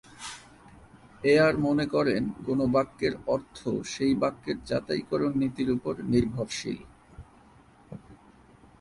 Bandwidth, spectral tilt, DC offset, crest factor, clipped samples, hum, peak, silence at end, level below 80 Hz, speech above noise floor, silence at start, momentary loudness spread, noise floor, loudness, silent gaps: 11.5 kHz; -6 dB/octave; under 0.1%; 18 dB; under 0.1%; none; -10 dBFS; 0.65 s; -54 dBFS; 29 dB; 0.2 s; 17 LU; -56 dBFS; -27 LUFS; none